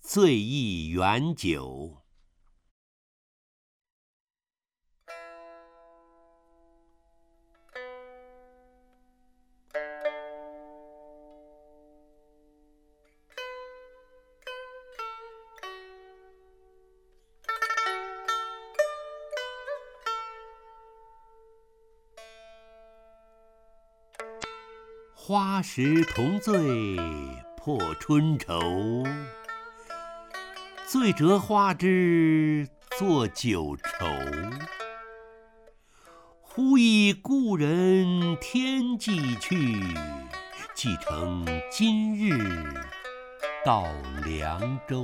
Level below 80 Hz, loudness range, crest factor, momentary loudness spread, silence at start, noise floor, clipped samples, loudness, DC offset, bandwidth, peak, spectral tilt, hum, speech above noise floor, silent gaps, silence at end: -52 dBFS; 20 LU; 22 dB; 22 LU; 0.05 s; under -90 dBFS; under 0.1%; -27 LUFS; under 0.1%; 16.5 kHz; -8 dBFS; -5.5 dB/octave; none; over 65 dB; 2.71-4.27 s; 0 s